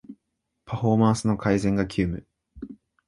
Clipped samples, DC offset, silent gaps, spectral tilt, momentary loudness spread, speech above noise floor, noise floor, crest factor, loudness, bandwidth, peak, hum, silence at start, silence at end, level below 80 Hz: under 0.1%; under 0.1%; none; -7 dB/octave; 21 LU; 56 dB; -79 dBFS; 20 dB; -24 LUFS; 11.5 kHz; -6 dBFS; none; 0.1 s; 0.35 s; -46 dBFS